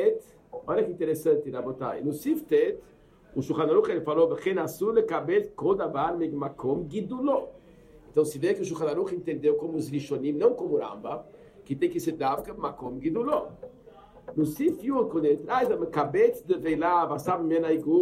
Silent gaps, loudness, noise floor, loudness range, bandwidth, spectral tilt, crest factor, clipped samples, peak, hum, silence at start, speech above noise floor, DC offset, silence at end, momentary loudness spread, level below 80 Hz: none; -27 LUFS; -52 dBFS; 4 LU; 15.5 kHz; -7 dB/octave; 18 dB; under 0.1%; -10 dBFS; none; 0 s; 26 dB; under 0.1%; 0 s; 11 LU; -60 dBFS